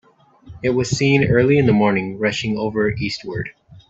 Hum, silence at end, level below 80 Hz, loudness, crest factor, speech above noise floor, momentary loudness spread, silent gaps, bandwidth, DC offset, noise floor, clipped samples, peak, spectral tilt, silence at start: none; 0.1 s; -46 dBFS; -18 LUFS; 16 dB; 27 dB; 11 LU; none; 8 kHz; under 0.1%; -44 dBFS; under 0.1%; -2 dBFS; -6 dB/octave; 0.45 s